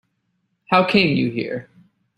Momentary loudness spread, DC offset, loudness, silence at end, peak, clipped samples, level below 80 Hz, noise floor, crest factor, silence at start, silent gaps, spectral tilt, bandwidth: 13 LU; under 0.1%; -18 LUFS; 0.55 s; -2 dBFS; under 0.1%; -56 dBFS; -71 dBFS; 20 dB; 0.7 s; none; -7 dB/octave; 11 kHz